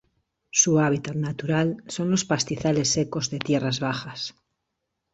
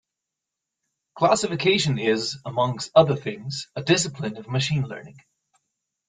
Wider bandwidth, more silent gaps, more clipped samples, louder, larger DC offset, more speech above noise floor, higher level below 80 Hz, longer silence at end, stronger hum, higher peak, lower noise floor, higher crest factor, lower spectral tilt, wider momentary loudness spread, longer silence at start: second, 8.2 kHz vs 9.6 kHz; neither; neither; about the same, -24 LUFS vs -23 LUFS; neither; second, 56 dB vs 62 dB; about the same, -58 dBFS vs -60 dBFS; second, 0.8 s vs 0.95 s; neither; about the same, -6 dBFS vs -4 dBFS; second, -80 dBFS vs -85 dBFS; about the same, 20 dB vs 22 dB; about the same, -4 dB/octave vs -4.5 dB/octave; about the same, 10 LU vs 12 LU; second, 0.55 s vs 1.15 s